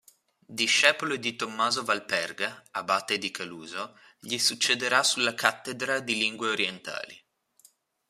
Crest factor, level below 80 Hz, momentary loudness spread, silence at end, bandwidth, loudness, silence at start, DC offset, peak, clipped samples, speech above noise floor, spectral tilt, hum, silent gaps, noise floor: 26 dB; -78 dBFS; 15 LU; 0.9 s; 15 kHz; -26 LUFS; 0.5 s; under 0.1%; -2 dBFS; under 0.1%; 34 dB; -1 dB/octave; none; none; -62 dBFS